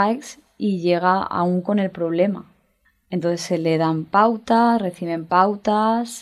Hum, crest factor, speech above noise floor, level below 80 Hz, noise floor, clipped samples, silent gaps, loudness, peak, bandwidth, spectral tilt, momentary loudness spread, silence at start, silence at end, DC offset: none; 18 dB; 44 dB; -62 dBFS; -64 dBFS; under 0.1%; none; -20 LUFS; -4 dBFS; 13.5 kHz; -6.5 dB/octave; 9 LU; 0 s; 0 s; under 0.1%